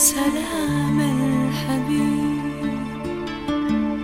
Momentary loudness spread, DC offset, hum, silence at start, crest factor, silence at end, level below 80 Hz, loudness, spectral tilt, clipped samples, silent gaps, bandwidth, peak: 8 LU; under 0.1%; none; 0 s; 18 dB; 0 s; -44 dBFS; -22 LUFS; -4.5 dB/octave; under 0.1%; none; 16 kHz; -2 dBFS